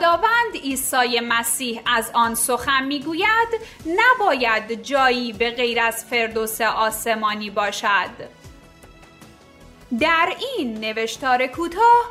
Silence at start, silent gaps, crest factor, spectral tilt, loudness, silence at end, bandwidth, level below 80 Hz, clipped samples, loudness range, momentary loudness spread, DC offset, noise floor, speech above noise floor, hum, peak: 0 s; none; 16 dB; -1.5 dB/octave; -20 LUFS; 0 s; 16 kHz; -52 dBFS; under 0.1%; 5 LU; 8 LU; under 0.1%; -47 dBFS; 26 dB; none; -4 dBFS